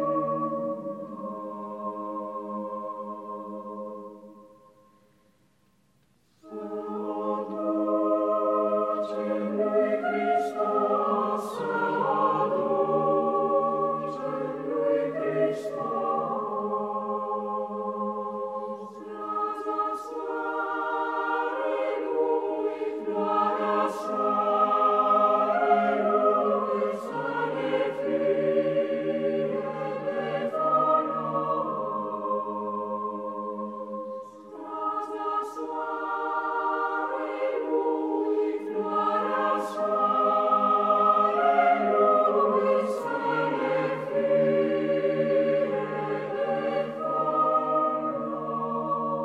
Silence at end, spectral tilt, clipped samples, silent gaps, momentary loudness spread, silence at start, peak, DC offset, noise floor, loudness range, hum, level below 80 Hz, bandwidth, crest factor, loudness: 0 s; -7 dB/octave; under 0.1%; none; 12 LU; 0 s; -10 dBFS; under 0.1%; -66 dBFS; 10 LU; none; -80 dBFS; 12 kHz; 18 dB; -27 LUFS